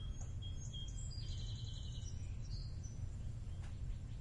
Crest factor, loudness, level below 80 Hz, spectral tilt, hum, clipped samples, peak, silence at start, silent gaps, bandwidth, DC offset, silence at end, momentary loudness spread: 12 dB; -48 LUFS; -48 dBFS; -5 dB/octave; none; under 0.1%; -32 dBFS; 0 s; none; 11 kHz; under 0.1%; 0 s; 2 LU